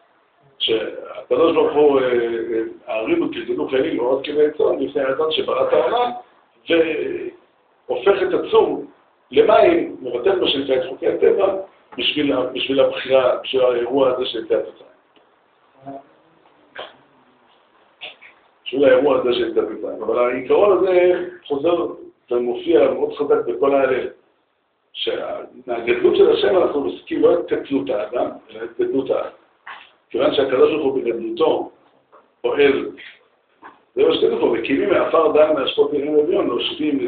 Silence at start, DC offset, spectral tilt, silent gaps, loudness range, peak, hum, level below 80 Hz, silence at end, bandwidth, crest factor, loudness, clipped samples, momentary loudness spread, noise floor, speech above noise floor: 0.6 s; under 0.1%; -2.5 dB/octave; none; 4 LU; -2 dBFS; none; -58 dBFS; 0 s; 4.6 kHz; 18 dB; -18 LUFS; under 0.1%; 15 LU; -66 dBFS; 48 dB